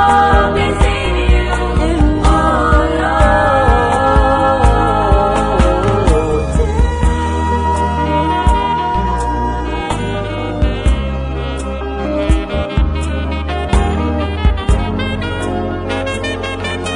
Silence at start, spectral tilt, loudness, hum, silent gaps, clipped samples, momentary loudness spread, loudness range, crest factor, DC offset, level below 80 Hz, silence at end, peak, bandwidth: 0 s; -6.5 dB/octave; -15 LUFS; none; none; under 0.1%; 8 LU; 6 LU; 12 dB; 0.3%; -18 dBFS; 0 s; 0 dBFS; 10.5 kHz